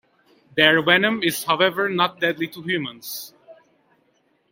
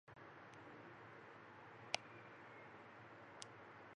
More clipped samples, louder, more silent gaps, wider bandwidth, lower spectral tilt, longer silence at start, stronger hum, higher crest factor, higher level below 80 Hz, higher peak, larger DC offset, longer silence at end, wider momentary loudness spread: neither; first, -20 LUFS vs -55 LUFS; neither; first, 16.5 kHz vs 8.8 kHz; about the same, -3.5 dB/octave vs -2.5 dB/octave; first, 0.55 s vs 0.05 s; neither; second, 22 dB vs 38 dB; first, -66 dBFS vs -88 dBFS; first, 0 dBFS vs -18 dBFS; neither; first, 1 s vs 0 s; first, 16 LU vs 12 LU